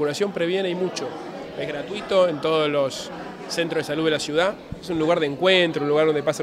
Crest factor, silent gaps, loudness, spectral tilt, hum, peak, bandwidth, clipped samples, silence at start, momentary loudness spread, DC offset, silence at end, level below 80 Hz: 18 dB; none; -22 LUFS; -4.5 dB/octave; none; -6 dBFS; 15 kHz; under 0.1%; 0 s; 13 LU; under 0.1%; 0 s; -56 dBFS